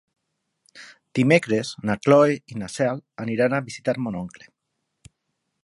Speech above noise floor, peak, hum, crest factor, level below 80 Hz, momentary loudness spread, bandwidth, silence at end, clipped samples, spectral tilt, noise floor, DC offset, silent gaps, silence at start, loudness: 56 dB; -2 dBFS; none; 22 dB; -62 dBFS; 14 LU; 11.5 kHz; 1.35 s; under 0.1%; -6 dB/octave; -78 dBFS; under 0.1%; none; 0.75 s; -22 LUFS